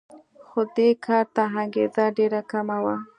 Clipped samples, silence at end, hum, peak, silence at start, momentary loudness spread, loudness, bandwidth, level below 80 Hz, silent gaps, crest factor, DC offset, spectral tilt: under 0.1%; 0.15 s; none; -6 dBFS; 0.15 s; 6 LU; -23 LUFS; 9.4 kHz; -76 dBFS; none; 18 dB; under 0.1%; -7.5 dB/octave